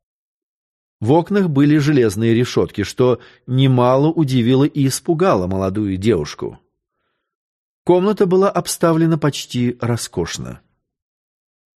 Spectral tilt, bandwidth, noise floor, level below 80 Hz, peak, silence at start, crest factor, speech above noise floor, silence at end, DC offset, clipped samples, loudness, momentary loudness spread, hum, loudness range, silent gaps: -6.5 dB/octave; 13 kHz; -73 dBFS; -50 dBFS; -2 dBFS; 1 s; 16 dB; 57 dB; 1.2 s; under 0.1%; under 0.1%; -17 LUFS; 10 LU; none; 4 LU; 7.35-7.85 s